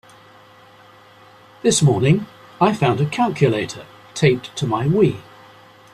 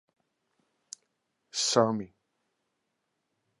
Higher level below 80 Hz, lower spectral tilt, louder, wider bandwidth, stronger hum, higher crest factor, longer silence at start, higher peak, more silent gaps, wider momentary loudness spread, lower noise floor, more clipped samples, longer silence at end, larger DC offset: first, -52 dBFS vs -76 dBFS; first, -5.5 dB/octave vs -3.5 dB/octave; first, -18 LUFS vs -28 LUFS; first, 13 kHz vs 11.5 kHz; neither; second, 18 dB vs 26 dB; about the same, 1.65 s vs 1.55 s; first, -2 dBFS vs -8 dBFS; neither; second, 15 LU vs 23 LU; second, -47 dBFS vs -81 dBFS; neither; second, 0.75 s vs 1.55 s; neither